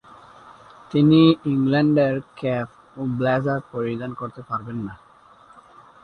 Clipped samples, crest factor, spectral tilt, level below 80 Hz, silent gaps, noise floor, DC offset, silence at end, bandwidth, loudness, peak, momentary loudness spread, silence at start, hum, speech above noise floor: under 0.1%; 18 dB; -9 dB/octave; -58 dBFS; none; -51 dBFS; under 0.1%; 1.1 s; 5.4 kHz; -21 LUFS; -4 dBFS; 16 LU; 0.45 s; none; 30 dB